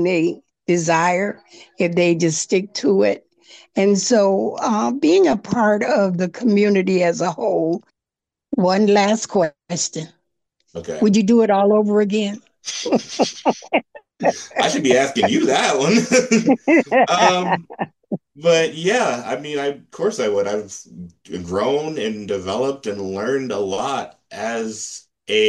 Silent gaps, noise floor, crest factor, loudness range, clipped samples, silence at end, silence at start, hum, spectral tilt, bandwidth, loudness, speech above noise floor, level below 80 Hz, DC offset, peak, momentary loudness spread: none; -87 dBFS; 18 dB; 7 LU; under 0.1%; 0 s; 0 s; none; -4.5 dB/octave; 11.5 kHz; -18 LUFS; 69 dB; -62 dBFS; under 0.1%; -2 dBFS; 13 LU